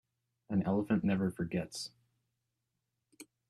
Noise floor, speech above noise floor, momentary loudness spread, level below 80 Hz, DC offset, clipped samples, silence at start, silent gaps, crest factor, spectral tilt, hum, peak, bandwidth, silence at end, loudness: -86 dBFS; 52 dB; 11 LU; -66 dBFS; under 0.1%; under 0.1%; 0.5 s; none; 18 dB; -6.5 dB/octave; none; -18 dBFS; 12.5 kHz; 0.25 s; -34 LUFS